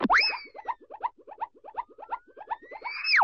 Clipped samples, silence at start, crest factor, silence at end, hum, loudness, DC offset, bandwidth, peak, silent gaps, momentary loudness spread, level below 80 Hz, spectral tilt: under 0.1%; 0 s; 18 dB; 0 s; none; -31 LUFS; under 0.1%; 8 kHz; -12 dBFS; none; 17 LU; -62 dBFS; 1 dB/octave